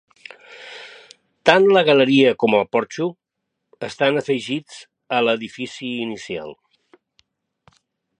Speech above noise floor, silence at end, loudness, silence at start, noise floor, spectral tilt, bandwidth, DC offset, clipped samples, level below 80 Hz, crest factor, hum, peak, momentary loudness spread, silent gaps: 60 dB; 1.65 s; -19 LUFS; 0.5 s; -79 dBFS; -5 dB/octave; 10 kHz; under 0.1%; under 0.1%; -66 dBFS; 20 dB; none; 0 dBFS; 24 LU; none